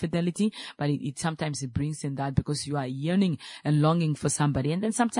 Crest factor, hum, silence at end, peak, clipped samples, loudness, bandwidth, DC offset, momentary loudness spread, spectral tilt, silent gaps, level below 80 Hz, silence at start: 16 dB; none; 0 s; -10 dBFS; under 0.1%; -28 LUFS; 11 kHz; under 0.1%; 7 LU; -6 dB/octave; none; -52 dBFS; 0 s